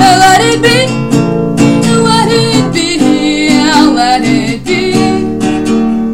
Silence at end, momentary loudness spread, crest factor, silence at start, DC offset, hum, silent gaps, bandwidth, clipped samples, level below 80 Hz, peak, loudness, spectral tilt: 0 s; 6 LU; 8 dB; 0 s; 2%; none; none; 16.5 kHz; 0.5%; -34 dBFS; 0 dBFS; -8 LUFS; -4.5 dB/octave